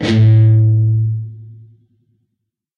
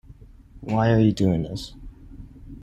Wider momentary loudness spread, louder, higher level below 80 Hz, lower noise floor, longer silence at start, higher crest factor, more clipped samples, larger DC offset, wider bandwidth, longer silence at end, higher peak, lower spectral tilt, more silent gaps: second, 14 LU vs 23 LU; first, -12 LUFS vs -22 LUFS; about the same, -46 dBFS vs -44 dBFS; first, -75 dBFS vs -47 dBFS; about the same, 0 s vs 0.1 s; second, 10 dB vs 16 dB; neither; neither; second, 6.4 kHz vs 10 kHz; first, 1.25 s vs 0 s; first, -4 dBFS vs -8 dBFS; about the same, -8.5 dB/octave vs -7.5 dB/octave; neither